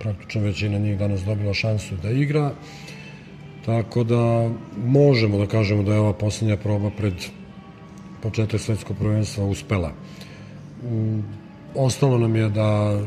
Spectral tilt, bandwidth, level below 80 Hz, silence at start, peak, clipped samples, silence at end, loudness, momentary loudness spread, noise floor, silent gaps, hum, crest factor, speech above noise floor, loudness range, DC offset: -7 dB/octave; 11 kHz; -50 dBFS; 0 s; -4 dBFS; under 0.1%; 0 s; -22 LUFS; 20 LU; -41 dBFS; none; none; 18 dB; 20 dB; 6 LU; under 0.1%